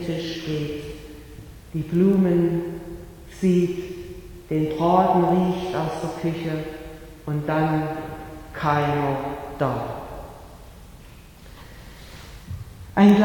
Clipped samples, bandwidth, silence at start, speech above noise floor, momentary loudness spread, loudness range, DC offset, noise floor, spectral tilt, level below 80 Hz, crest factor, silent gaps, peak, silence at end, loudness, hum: under 0.1%; 18.5 kHz; 0 s; 24 dB; 23 LU; 8 LU; under 0.1%; -45 dBFS; -7.5 dB/octave; -46 dBFS; 20 dB; none; -4 dBFS; 0 s; -23 LUFS; none